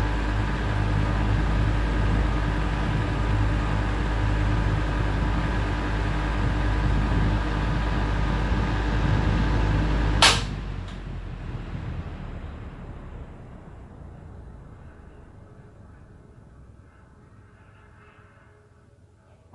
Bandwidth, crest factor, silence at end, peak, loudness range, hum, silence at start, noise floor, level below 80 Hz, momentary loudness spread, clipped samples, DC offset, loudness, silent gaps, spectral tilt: 11.5 kHz; 24 dB; 2.9 s; 0 dBFS; 20 LU; none; 0 s; -54 dBFS; -28 dBFS; 19 LU; under 0.1%; under 0.1%; -25 LUFS; none; -5 dB/octave